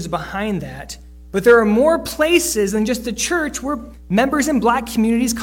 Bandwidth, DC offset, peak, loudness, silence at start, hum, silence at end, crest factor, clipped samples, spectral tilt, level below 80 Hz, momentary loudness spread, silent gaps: 17.5 kHz; under 0.1%; -2 dBFS; -17 LUFS; 0 s; none; 0 s; 16 dB; under 0.1%; -4 dB/octave; -40 dBFS; 13 LU; none